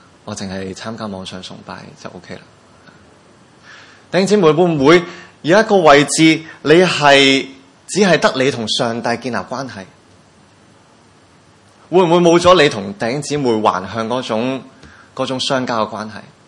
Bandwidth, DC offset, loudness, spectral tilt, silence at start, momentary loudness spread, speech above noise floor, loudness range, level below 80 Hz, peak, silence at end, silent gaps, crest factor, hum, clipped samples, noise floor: 11.5 kHz; under 0.1%; -14 LUFS; -4.5 dB/octave; 0.25 s; 21 LU; 34 dB; 15 LU; -54 dBFS; 0 dBFS; 0.3 s; none; 16 dB; none; 0.1%; -48 dBFS